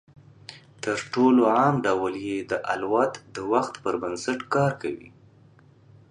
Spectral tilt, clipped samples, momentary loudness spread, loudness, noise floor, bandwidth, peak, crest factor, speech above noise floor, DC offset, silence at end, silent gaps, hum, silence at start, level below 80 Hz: -6 dB/octave; under 0.1%; 16 LU; -25 LUFS; -54 dBFS; 10.5 kHz; -8 dBFS; 18 dB; 30 dB; under 0.1%; 1.05 s; none; none; 0.5 s; -64 dBFS